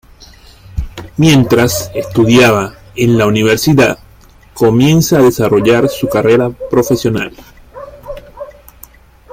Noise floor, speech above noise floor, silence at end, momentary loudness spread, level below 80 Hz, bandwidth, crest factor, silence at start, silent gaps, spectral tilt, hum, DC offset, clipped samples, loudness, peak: -41 dBFS; 31 dB; 0.85 s; 21 LU; -34 dBFS; 16.5 kHz; 12 dB; 0.75 s; none; -5.5 dB/octave; none; under 0.1%; under 0.1%; -11 LUFS; 0 dBFS